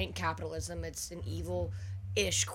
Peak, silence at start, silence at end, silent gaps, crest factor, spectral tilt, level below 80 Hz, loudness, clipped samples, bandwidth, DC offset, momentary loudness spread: -16 dBFS; 0 s; 0 s; none; 18 dB; -3 dB/octave; -48 dBFS; -36 LUFS; under 0.1%; 16.5 kHz; under 0.1%; 9 LU